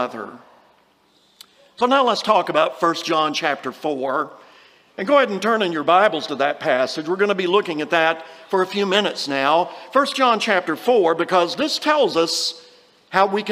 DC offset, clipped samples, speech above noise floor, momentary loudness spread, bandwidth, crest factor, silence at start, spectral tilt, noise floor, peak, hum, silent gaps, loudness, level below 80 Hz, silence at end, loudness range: under 0.1%; under 0.1%; 39 dB; 8 LU; 15.5 kHz; 18 dB; 0 s; -3.5 dB/octave; -58 dBFS; -2 dBFS; none; none; -19 LUFS; -72 dBFS; 0 s; 2 LU